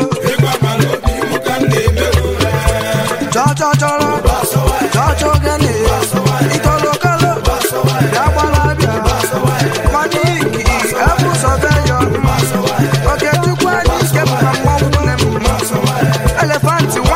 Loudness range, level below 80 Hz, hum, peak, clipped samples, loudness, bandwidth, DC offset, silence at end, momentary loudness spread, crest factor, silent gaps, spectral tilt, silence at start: 1 LU; -22 dBFS; none; 0 dBFS; under 0.1%; -13 LUFS; 16 kHz; under 0.1%; 0 s; 2 LU; 12 dB; none; -5 dB/octave; 0 s